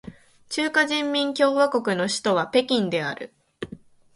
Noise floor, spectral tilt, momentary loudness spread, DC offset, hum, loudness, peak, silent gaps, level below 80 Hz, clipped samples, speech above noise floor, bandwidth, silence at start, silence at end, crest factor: -45 dBFS; -4 dB/octave; 18 LU; under 0.1%; none; -22 LUFS; -6 dBFS; none; -64 dBFS; under 0.1%; 22 dB; 11.5 kHz; 0.05 s; 0.4 s; 18 dB